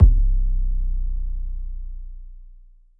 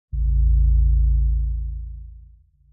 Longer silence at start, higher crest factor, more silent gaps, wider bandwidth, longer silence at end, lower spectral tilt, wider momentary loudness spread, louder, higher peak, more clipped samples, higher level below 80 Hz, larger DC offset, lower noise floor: second, 0 s vs 0.15 s; first, 18 dB vs 10 dB; neither; first, 0.7 kHz vs 0.2 kHz; about the same, 0.5 s vs 0.5 s; second, -12.5 dB/octave vs -18 dB/octave; first, 19 LU vs 16 LU; second, -26 LUFS vs -21 LUFS; first, -2 dBFS vs -10 dBFS; neither; about the same, -20 dBFS vs -20 dBFS; neither; about the same, -47 dBFS vs -50 dBFS